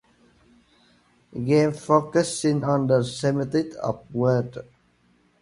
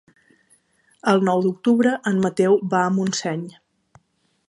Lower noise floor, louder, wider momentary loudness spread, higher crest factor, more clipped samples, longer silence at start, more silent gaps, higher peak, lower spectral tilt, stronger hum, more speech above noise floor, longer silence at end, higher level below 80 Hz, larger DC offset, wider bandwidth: second, -62 dBFS vs -66 dBFS; second, -23 LUFS vs -20 LUFS; about the same, 11 LU vs 9 LU; about the same, 20 dB vs 18 dB; neither; first, 1.35 s vs 1.05 s; neither; about the same, -4 dBFS vs -4 dBFS; about the same, -6.5 dB/octave vs -6 dB/octave; first, 60 Hz at -55 dBFS vs none; second, 40 dB vs 46 dB; second, 0.8 s vs 1 s; first, -60 dBFS vs -68 dBFS; neither; about the same, 11.5 kHz vs 11.5 kHz